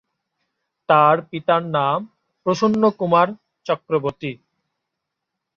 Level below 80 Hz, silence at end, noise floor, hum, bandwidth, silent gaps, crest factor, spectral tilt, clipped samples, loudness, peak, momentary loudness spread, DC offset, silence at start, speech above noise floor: -62 dBFS; 1.25 s; -81 dBFS; none; 7.2 kHz; none; 18 dB; -6.5 dB/octave; under 0.1%; -19 LUFS; -2 dBFS; 14 LU; under 0.1%; 0.9 s; 62 dB